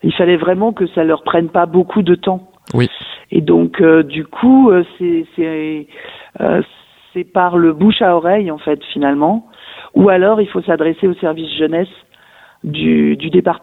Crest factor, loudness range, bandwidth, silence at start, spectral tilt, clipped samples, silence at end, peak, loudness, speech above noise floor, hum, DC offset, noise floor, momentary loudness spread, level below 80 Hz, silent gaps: 14 dB; 3 LU; 4.7 kHz; 0.05 s; -8.5 dB/octave; under 0.1%; 0.05 s; 0 dBFS; -13 LUFS; 32 dB; none; under 0.1%; -45 dBFS; 13 LU; -50 dBFS; none